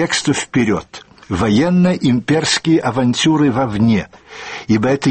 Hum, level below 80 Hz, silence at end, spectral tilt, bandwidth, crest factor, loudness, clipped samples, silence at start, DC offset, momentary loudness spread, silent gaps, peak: none; -44 dBFS; 0 s; -5 dB/octave; 8.8 kHz; 12 dB; -15 LUFS; under 0.1%; 0 s; 0.1%; 12 LU; none; -4 dBFS